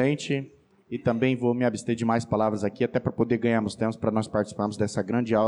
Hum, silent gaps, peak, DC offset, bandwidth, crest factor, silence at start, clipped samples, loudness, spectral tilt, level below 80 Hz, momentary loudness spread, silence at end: none; none; -12 dBFS; under 0.1%; 11 kHz; 14 dB; 0 s; under 0.1%; -26 LUFS; -6.5 dB/octave; -58 dBFS; 5 LU; 0 s